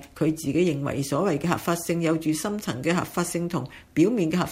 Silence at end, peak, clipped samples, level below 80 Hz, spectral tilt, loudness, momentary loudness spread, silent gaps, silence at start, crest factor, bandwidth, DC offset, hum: 0 s; -8 dBFS; under 0.1%; -54 dBFS; -5.5 dB/octave; -25 LUFS; 6 LU; none; 0 s; 16 dB; 16 kHz; under 0.1%; none